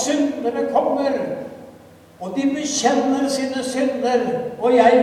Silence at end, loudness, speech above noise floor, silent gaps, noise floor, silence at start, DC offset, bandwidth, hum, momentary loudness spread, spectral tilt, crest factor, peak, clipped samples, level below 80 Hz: 0 s; -20 LUFS; 27 dB; none; -45 dBFS; 0 s; under 0.1%; 13.5 kHz; none; 10 LU; -3.5 dB/octave; 18 dB; 0 dBFS; under 0.1%; -62 dBFS